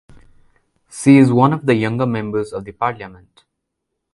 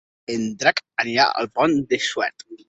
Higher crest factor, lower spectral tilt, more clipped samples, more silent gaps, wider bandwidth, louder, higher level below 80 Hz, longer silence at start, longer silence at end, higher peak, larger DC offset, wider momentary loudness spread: about the same, 18 dB vs 22 dB; first, -7 dB/octave vs -3.5 dB/octave; neither; neither; first, 11.5 kHz vs 8.2 kHz; first, -16 LUFS vs -21 LUFS; first, -54 dBFS vs -62 dBFS; first, 0.95 s vs 0.3 s; first, 1 s vs 0.15 s; about the same, 0 dBFS vs 0 dBFS; neither; first, 20 LU vs 8 LU